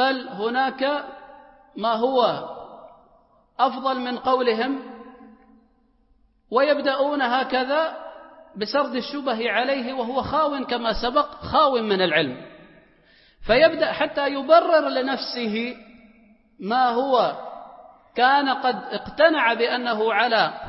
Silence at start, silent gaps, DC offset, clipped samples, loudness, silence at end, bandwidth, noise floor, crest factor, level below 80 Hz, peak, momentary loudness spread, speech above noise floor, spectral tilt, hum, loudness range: 0 s; none; under 0.1%; under 0.1%; -22 LUFS; 0 s; 6 kHz; -61 dBFS; 20 dB; -50 dBFS; -4 dBFS; 18 LU; 40 dB; -7.5 dB/octave; none; 5 LU